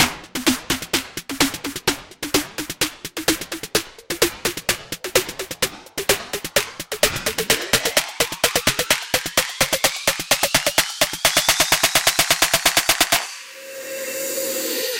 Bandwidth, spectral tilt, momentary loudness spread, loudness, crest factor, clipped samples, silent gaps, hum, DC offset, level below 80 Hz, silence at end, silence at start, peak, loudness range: 17 kHz; -1 dB/octave; 10 LU; -19 LUFS; 22 dB; under 0.1%; none; none; under 0.1%; -46 dBFS; 0 s; 0 s; 0 dBFS; 6 LU